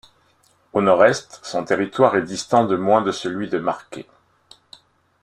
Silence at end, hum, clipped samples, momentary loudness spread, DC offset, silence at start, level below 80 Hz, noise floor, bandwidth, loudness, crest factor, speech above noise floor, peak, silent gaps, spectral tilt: 1.2 s; none; under 0.1%; 12 LU; under 0.1%; 0.75 s; -62 dBFS; -60 dBFS; 11.5 kHz; -19 LUFS; 20 dB; 41 dB; -2 dBFS; none; -5 dB/octave